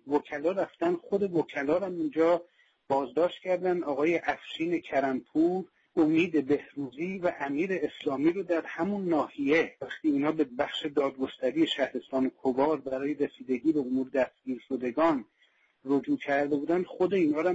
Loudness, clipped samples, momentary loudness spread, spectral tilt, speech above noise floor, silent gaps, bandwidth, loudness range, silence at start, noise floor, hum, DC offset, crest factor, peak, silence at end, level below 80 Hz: -29 LUFS; under 0.1%; 6 LU; -6.5 dB/octave; 39 dB; none; 7.8 kHz; 1 LU; 0.05 s; -68 dBFS; none; under 0.1%; 14 dB; -14 dBFS; 0 s; -70 dBFS